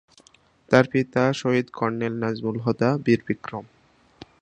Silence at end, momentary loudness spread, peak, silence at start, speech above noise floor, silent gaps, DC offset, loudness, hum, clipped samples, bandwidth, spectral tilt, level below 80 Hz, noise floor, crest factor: 0.75 s; 10 LU; 0 dBFS; 0.7 s; 35 dB; none; under 0.1%; -23 LUFS; none; under 0.1%; 9.6 kHz; -7 dB/octave; -60 dBFS; -57 dBFS; 24 dB